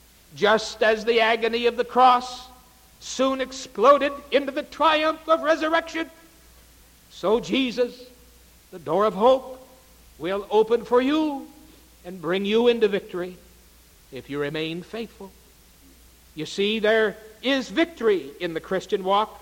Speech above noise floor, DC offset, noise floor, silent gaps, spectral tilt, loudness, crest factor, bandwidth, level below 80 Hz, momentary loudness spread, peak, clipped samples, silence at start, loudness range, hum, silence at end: 30 dB; under 0.1%; -53 dBFS; none; -4 dB/octave; -23 LUFS; 20 dB; 17 kHz; -56 dBFS; 16 LU; -4 dBFS; under 0.1%; 0.35 s; 6 LU; none; 0.05 s